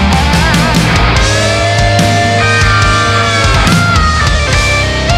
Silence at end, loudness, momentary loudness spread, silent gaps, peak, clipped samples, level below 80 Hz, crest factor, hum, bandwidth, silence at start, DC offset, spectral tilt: 0 s; -9 LUFS; 2 LU; none; 0 dBFS; under 0.1%; -16 dBFS; 8 dB; none; 15 kHz; 0 s; under 0.1%; -4.5 dB/octave